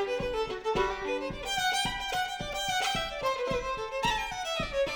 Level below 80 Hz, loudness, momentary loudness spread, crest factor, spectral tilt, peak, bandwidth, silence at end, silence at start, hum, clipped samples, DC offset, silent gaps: -48 dBFS; -31 LUFS; 5 LU; 16 dB; -2.5 dB/octave; -16 dBFS; over 20 kHz; 0 s; 0 s; none; under 0.1%; under 0.1%; none